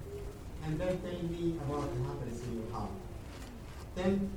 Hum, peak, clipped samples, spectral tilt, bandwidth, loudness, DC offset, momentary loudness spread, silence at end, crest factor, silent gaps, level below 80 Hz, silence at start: none; -18 dBFS; under 0.1%; -7 dB/octave; 18.5 kHz; -38 LUFS; under 0.1%; 12 LU; 0 s; 18 dB; none; -48 dBFS; 0 s